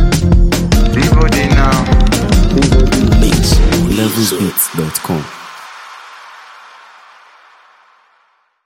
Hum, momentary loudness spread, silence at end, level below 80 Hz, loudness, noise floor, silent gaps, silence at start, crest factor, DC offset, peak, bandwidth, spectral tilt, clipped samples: none; 20 LU; 2.5 s; -16 dBFS; -12 LUFS; -56 dBFS; none; 0 s; 12 dB; under 0.1%; 0 dBFS; 16.5 kHz; -5 dB/octave; under 0.1%